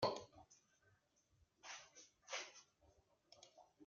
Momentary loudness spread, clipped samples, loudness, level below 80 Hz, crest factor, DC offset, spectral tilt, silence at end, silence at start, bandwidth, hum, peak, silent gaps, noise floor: 17 LU; under 0.1%; -52 LUFS; -82 dBFS; 26 dB; under 0.1%; -2 dB/octave; 0 s; 0 s; 7.4 kHz; none; -26 dBFS; none; -79 dBFS